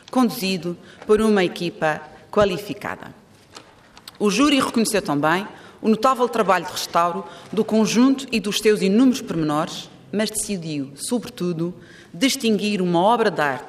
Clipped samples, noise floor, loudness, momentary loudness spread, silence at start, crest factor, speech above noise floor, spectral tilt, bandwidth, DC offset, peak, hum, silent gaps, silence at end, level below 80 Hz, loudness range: under 0.1%; -47 dBFS; -21 LUFS; 12 LU; 0.15 s; 16 dB; 27 dB; -4.5 dB/octave; 15.5 kHz; under 0.1%; -6 dBFS; none; none; 0 s; -54 dBFS; 4 LU